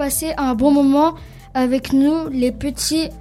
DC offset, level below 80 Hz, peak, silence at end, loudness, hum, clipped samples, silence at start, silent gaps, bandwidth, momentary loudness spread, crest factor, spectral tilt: under 0.1%; -38 dBFS; -2 dBFS; 0 s; -18 LUFS; none; under 0.1%; 0 s; none; 15.5 kHz; 7 LU; 16 dB; -4 dB/octave